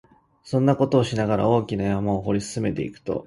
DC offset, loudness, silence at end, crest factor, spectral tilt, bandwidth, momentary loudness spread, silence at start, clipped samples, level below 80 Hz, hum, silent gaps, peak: under 0.1%; -23 LUFS; 0 s; 18 dB; -7 dB/octave; 11.5 kHz; 7 LU; 0.45 s; under 0.1%; -48 dBFS; none; none; -4 dBFS